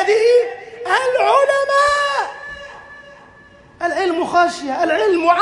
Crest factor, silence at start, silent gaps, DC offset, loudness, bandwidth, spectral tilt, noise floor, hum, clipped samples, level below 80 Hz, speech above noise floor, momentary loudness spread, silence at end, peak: 16 dB; 0 s; none; under 0.1%; -16 LUFS; 11.5 kHz; -3 dB/octave; -45 dBFS; none; under 0.1%; -54 dBFS; 30 dB; 17 LU; 0 s; -2 dBFS